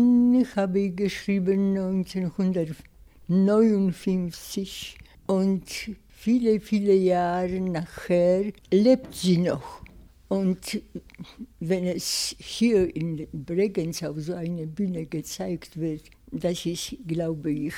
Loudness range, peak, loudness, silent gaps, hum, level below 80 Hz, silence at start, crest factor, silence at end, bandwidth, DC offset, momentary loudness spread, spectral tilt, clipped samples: 7 LU; -8 dBFS; -25 LUFS; none; none; -52 dBFS; 0 s; 18 dB; 0 s; 16 kHz; under 0.1%; 14 LU; -6 dB/octave; under 0.1%